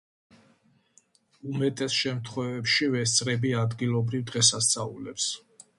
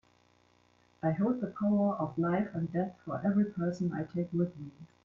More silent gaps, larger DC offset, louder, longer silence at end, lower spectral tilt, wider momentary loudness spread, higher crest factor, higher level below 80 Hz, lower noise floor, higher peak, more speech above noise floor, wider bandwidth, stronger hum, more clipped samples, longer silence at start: neither; neither; first, -26 LUFS vs -32 LUFS; first, 0.4 s vs 0.2 s; second, -3 dB/octave vs -10 dB/octave; first, 11 LU vs 6 LU; first, 20 dB vs 14 dB; about the same, -64 dBFS vs -68 dBFS; about the same, -64 dBFS vs -67 dBFS; first, -8 dBFS vs -18 dBFS; about the same, 38 dB vs 35 dB; first, 11.5 kHz vs 7.2 kHz; second, none vs 60 Hz at -50 dBFS; neither; first, 1.45 s vs 1.05 s